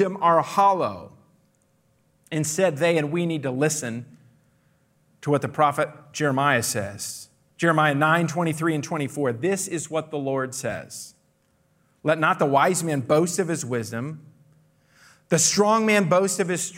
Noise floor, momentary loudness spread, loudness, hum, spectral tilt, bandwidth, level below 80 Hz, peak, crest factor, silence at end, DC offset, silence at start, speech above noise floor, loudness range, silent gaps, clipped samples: -65 dBFS; 13 LU; -23 LUFS; none; -4.5 dB/octave; 16 kHz; -68 dBFS; -6 dBFS; 18 dB; 0 s; under 0.1%; 0 s; 43 dB; 4 LU; none; under 0.1%